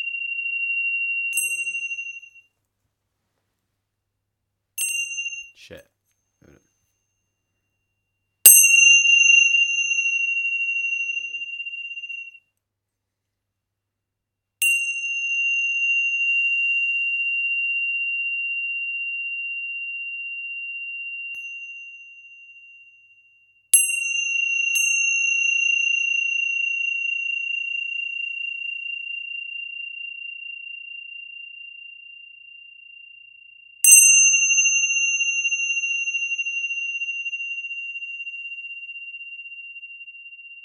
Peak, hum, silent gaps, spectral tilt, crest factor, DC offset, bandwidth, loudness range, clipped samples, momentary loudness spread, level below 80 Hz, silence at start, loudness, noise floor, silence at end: 0 dBFS; none; none; 6 dB/octave; 24 dB; under 0.1%; 18 kHz; 18 LU; under 0.1%; 22 LU; -80 dBFS; 0 s; -18 LUFS; -82 dBFS; 0.05 s